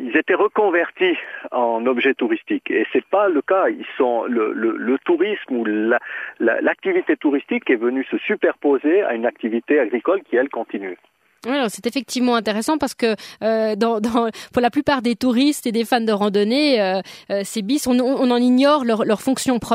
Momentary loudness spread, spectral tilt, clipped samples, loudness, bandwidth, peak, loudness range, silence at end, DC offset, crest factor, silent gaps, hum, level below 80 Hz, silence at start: 6 LU; -4.5 dB/octave; under 0.1%; -19 LUFS; 16 kHz; -2 dBFS; 3 LU; 0 s; under 0.1%; 16 dB; none; none; -60 dBFS; 0 s